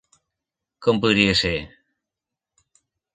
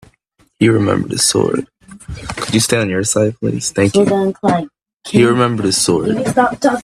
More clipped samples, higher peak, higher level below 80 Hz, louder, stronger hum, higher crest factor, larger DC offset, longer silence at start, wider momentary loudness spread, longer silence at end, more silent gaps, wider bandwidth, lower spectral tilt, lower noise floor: neither; about the same, -2 dBFS vs 0 dBFS; about the same, -46 dBFS vs -44 dBFS; second, -20 LUFS vs -14 LUFS; neither; first, 22 dB vs 14 dB; neither; first, 0.8 s vs 0.6 s; second, 8 LU vs 11 LU; first, 1.45 s vs 0 s; neither; second, 9.4 kHz vs 15.5 kHz; about the same, -5 dB/octave vs -4.5 dB/octave; first, -87 dBFS vs -57 dBFS